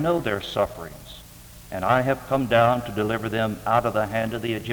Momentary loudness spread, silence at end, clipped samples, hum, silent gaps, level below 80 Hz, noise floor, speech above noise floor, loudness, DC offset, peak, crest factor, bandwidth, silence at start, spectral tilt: 21 LU; 0 s; under 0.1%; none; none; -48 dBFS; -45 dBFS; 21 dB; -23 LUFS; under 0.1%; -4 dBFS; 20 dB; over 20 kHz; 0 s; -6 dB/octave